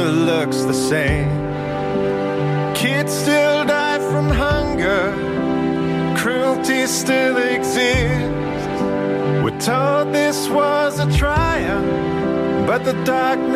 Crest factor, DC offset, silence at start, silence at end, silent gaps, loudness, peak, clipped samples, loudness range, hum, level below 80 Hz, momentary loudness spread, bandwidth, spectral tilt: 12 dB; under 0.1%; 0 s; 0 s; none; -18 LUFS; -6 dBFS; under 0.1%; 1 LU; none; -32 dBFS; 4 LU; 15.5 kHz; -5 dB/octave